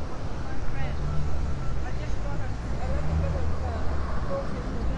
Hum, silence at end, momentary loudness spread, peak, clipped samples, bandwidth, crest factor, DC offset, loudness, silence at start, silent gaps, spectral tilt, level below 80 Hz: none; 0 s; 6 LU; -12 dBFS; under 0.1%; 8.6 kHz; 12 dB; under 0.1%; -32 LUFS; 0 s; none; -7 dB/octave; -32 dBFS